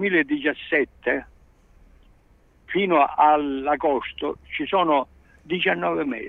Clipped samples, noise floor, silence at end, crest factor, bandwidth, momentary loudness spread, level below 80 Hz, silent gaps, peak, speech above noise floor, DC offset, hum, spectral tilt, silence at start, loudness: under 0.1%; -57 dBFS; 0 s; 18 dB; 4.4 kHz; 11 LU; -54 dBFS; none; -4 dBFS; 34 dB; under 0.1%; none; -7.5 dB/octave; 0 s; -22 LUFS